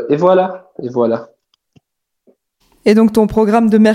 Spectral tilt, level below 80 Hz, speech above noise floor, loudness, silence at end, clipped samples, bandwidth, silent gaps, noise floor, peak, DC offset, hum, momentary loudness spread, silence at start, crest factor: -7.5 dB/octave; -46 dBFS; 52 dB; -13 LUFS; 0 s; under 0.1%; 13.5 kHz; none; -64 dBFS; 0 dBFS; under 0.1%; none; 11 LU; 0 s; 14 dB